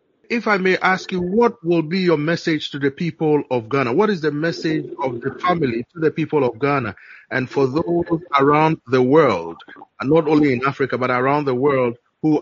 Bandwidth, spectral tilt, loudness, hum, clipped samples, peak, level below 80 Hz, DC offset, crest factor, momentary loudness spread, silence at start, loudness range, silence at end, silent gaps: 7.4 kHz; -5 dB/octave; -19 LUFS; none; under 0.1%; -2 dBFS; -56 dBFS; under 0.1%; 16 dB; 9 LU; 0.3 s; 3 LU; 0 s; none